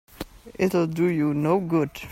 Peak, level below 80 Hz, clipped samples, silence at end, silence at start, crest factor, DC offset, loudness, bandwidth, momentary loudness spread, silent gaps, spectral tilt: -10 dBFS; -52 dBFS; under 0.1%; 0 s; 0.2 s; 14 dB; under 0.1%; -23 LUFS; 16 kHz; 17 LU; none; -7.5 dB/octave